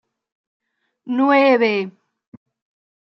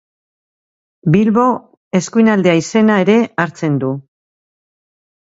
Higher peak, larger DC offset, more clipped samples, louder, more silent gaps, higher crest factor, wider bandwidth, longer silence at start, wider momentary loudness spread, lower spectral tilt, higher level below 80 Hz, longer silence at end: second, -4 dBFS vs 0 dBFS; neither; neither; about the same, -16 LUFS vs -14 LUFS; second, none vs 1.77-1.91 s; about the same, 18 dB vs 16 dB; second, 6 kHz vs 8 kHz; about the same, 1.05 s vs 1.05 s; about the same, 12 LU vs 10 LU; about the same, -6.5 dB/octave vs -6.5 dB/octave; second, -78 dBFS vs -58 dBFS; second, 1.15 s vs 1.4 s